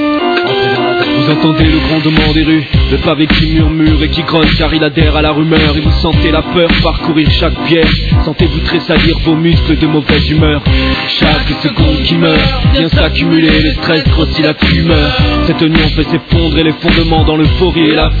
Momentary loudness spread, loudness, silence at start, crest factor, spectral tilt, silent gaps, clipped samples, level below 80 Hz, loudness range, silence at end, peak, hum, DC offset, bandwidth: 2 LU; -9 LUFS; 0 s; 8 dB; -8 dB/octave; none; under 0.1%; -16 dBFS; 1 LU; 0 s; 0 dBFS; none; under 0.1%; 4.9 kHz